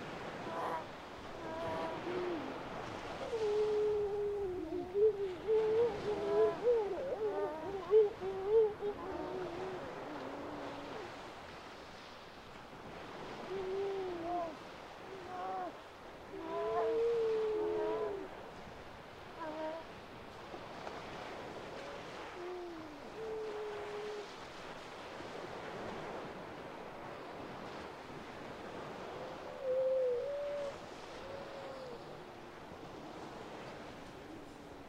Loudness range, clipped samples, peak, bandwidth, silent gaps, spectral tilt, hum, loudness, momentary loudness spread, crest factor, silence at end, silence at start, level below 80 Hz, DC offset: 12 LU; under 0.1%; -20 dBFS; 11.5 kHz; none; -5.5 dB/octave; none; -39 LUFS; 17 LU; 20 dB; 0 s; 0 s; -64 dBFS; under 0.1%